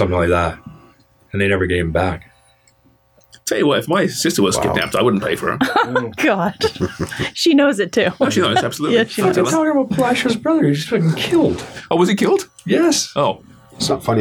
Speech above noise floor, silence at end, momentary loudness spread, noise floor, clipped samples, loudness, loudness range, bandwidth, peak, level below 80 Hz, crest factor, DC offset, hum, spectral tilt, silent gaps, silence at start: 39 dB; 0 s; 8 LU; -55 dBFS; under 0.1%; -17 LUFS; 4 LU; 19.5 kHz; -2 dBFS; -42 dBFS; 16 dB; under 0.1%; none; -4.5 dB/octave; none; 0 s